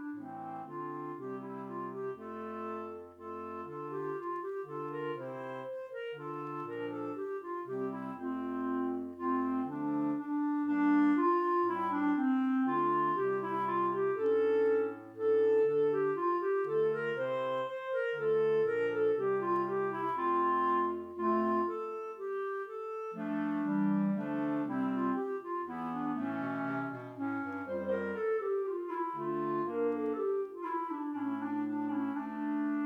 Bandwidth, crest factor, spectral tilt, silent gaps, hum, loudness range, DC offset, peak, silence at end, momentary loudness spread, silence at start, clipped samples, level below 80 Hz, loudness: 5.2 kHz; 14 dB; -8.5 dB/octave; none; none; 10 LU; under 0.1%; -20 dBFS; 0 s; 12 LU; 0 s; under 0.1%; -80 dBFS; -34 LUFS